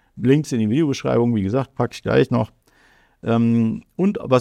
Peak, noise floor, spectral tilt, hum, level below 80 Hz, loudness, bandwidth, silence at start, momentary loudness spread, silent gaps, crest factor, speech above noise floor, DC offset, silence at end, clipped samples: -2 dBFS; -56 dBFS; -7.5 dB/octave; none; -52 dBFS; -20 LUFS; 11.5 kHz; 0.15 s; 6 LU; none; 18 dB; 37 dB; under 0.1%; 0 s; under 0.1%